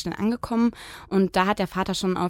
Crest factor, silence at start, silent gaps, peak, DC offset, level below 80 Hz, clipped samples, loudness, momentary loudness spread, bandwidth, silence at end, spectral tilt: 18 dB; 0 s; none; -6 dBFS; under 0.1%; -50 dBFS; under 0.1%; -24 LUFS; 5 LU; 16.5 kHz; 0 s; -5.5 dB/octave